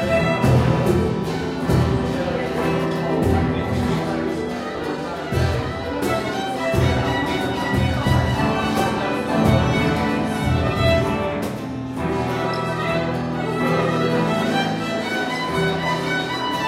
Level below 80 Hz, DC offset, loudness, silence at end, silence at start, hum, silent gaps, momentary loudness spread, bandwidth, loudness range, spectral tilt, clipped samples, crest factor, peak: -36 dBFS; under 0.1%; -21 LUFS; 0 s; 0 s; none; none; 6 LU; 16 kHz; 3 LU; -6.5 dB/octave; under 0.1%; 16 dB; -4 dBFS